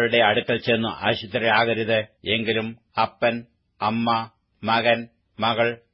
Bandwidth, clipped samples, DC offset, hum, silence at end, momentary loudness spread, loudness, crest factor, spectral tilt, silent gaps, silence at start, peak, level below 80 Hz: 5.8 kHz; under 0.1%; under 0.1%; none; 0.15 s; 8 LU; -22 LUFS; 18 dB; -9.5 dB/octave; none; 0 s; -4 dBFS; -60 dBFS